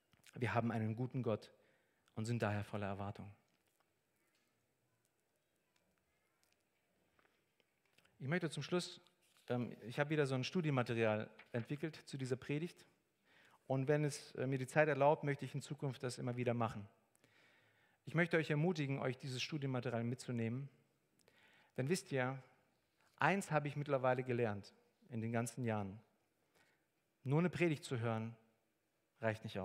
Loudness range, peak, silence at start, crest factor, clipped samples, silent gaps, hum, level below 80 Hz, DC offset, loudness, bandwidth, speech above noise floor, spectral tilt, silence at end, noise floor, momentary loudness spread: 8 LU; -16 dBFS; 0.25 s; 26 dB; under 0.1%; none; none; -82 dBFS; under 0.1%; -40 LUFS; 15 kHz; 44 dB; -6 dB/octave; 0 s; -84 dBFS; 13 LU